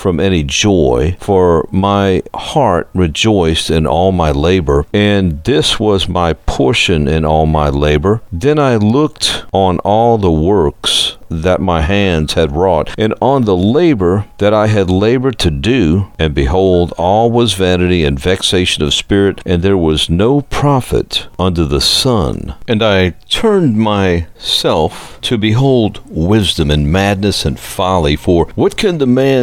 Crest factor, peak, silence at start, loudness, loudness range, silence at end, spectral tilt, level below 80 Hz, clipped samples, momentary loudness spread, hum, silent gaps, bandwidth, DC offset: 12 dB; 0 dBFS; 0 s; -12 LUFS; 1 LU; 0 s; -5.5 dB/octave; -26 dBFS; under 0.1%; 4 LU; none; none; 16.5 kHz; under 0.1%